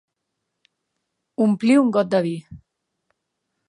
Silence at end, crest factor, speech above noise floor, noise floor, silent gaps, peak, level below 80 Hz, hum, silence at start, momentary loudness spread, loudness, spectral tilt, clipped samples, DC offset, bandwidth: 1.1 s; 18 dB; 60 dB; -79 dBFS; none; -6 dBFS; -62 dBFS; none; 1.4 s; 16 LU; -19 LUFS; -7 dB/octave; under 0.1%; under 0.1%; 11 kHz